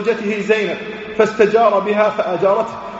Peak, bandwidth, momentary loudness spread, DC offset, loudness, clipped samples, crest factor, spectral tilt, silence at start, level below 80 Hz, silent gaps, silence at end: 0 dBFS; 8 kHz; 8 LU; under 0.1%; -16 LUFS; under 0.1%; 16 dB; -3.5 dB/octave; 0 s; -56 dBFS; none; 0 s